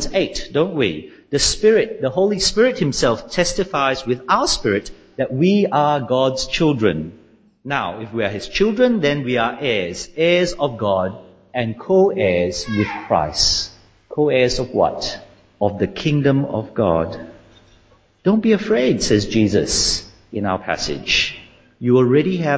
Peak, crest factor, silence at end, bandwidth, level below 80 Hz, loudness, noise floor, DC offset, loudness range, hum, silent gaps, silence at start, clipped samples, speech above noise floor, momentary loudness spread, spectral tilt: -2 dBFS; 16 dB; 0 s; 8 kHz; -40 dBFS; -18 LUFS; -53 dBFS; under 0.1%; 2 LU; none; none; 0 s; under 0.1%; 36 dB; 9 LU; -4.5 dB/octave